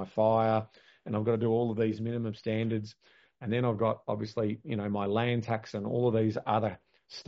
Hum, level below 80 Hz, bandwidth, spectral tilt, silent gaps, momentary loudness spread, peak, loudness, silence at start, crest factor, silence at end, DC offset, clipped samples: none; -68 dBFS; 7.2 kHz; -6.5 dB/octave; none; 9 LU; -14 dBFS; -31 LUFS; 0 s; 16 dB; 0.05 s; under 0.1%; under 0.1%